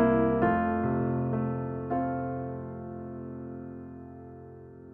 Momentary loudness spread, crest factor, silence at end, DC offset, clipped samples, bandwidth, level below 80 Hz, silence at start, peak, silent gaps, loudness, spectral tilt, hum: 21 LU; 16 dB; 0 s; under 0.1%; under 0.1%; 3.4 kHz; -52 dBFS; 0 s; -14 dBFS; none; -30 LUFS; -11.5 dB/octave; none